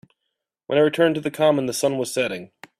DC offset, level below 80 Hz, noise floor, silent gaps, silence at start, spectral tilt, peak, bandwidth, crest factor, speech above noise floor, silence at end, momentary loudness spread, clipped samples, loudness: under 0.1%; -66 dBFS; -80 dBFS; none; 0.7 s; -4.5 dB/octave; -6 dBFS; 15.5 kHz; 16 dB; 59 dB; 0.35 s; 7 LU; under 0.1%; -21 LUFS